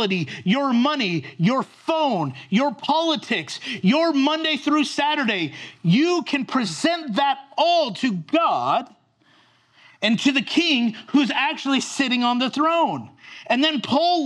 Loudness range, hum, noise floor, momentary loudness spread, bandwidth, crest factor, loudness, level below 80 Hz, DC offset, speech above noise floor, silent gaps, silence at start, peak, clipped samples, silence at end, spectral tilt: 2 LU; none; -58 dBFS; 6 LU; 11.5 kHz; 16 dB; -21 LUFS; -76 dBFS; under 0.1%; 37 dB; none; 0 s; -6 dBFS; under 0.1%; 0 s; -5 dB/octave